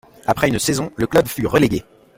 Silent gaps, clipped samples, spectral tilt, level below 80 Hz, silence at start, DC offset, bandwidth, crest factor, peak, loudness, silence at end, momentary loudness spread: none; under 0.1%; -5 dB/octave; -42 dBFS; 0.25 s; under 0.1%; 16.5 kHz; 18 dB; -2 dBFS; -18 LUFS; 0.35 s; 5 LU